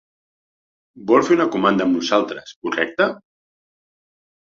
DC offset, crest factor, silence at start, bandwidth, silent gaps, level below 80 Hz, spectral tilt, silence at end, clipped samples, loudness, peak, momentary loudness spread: under 0.1%; 18 dB; 0.95 s; 7.4 kHz; 2.56-2.62 s; -62 dBFS; -5 dB/octave; 1.3 s; under 0.1%; -19 LUFS; -2 dBFS; 13 LU